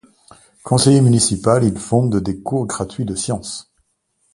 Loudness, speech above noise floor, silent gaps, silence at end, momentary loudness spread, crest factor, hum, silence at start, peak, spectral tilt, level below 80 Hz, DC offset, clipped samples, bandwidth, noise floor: -17 LUFS; 50 dB; none; 0.75 s; 13 LU; 18 dB; none; 0.65 s; 0 dBFS; -5.5 dB/octave; -44 dBFS; under 0.1%; under 0.1%; 11.5 kHz; -66 dBFS